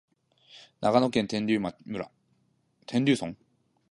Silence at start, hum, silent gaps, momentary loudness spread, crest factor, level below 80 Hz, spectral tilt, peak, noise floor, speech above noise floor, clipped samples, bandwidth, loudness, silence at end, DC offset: 0.55 s; none; none; 13 LU; 22 dB; -66 dBFS; -6 dB/octave; -8 dBFS; -70 dBFS; 43 dB; under 0.1%; 11.5 kHz; -28 LUFS; 0.6 s; under 0.1%